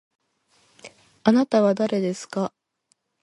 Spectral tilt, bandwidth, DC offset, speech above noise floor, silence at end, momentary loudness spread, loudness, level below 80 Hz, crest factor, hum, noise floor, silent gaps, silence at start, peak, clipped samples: -6.5 dB/octave; 11.5 kHz; under 0.1%; 49 dB; 0.75 s; 10 LU; -22 LUFS; -70 dBFS; 22 dB; none; -70 dBFS; none; 0.85 s; -4 dBFS; under 0.1%